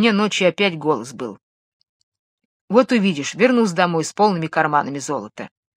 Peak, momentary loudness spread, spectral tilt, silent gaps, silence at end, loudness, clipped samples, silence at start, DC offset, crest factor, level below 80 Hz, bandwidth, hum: 0 dBFS; 14 LU; -5 dB/octave; 1.43-1.80 s, 1.89-2.12 s, 2.19-2.38 s, 2.45-2.68 s; 0.3 s; -18 LUFS; under 0.1%; 0 s; under 0.1%; 20 dB; -70 dBFS; 13.5 kHz; none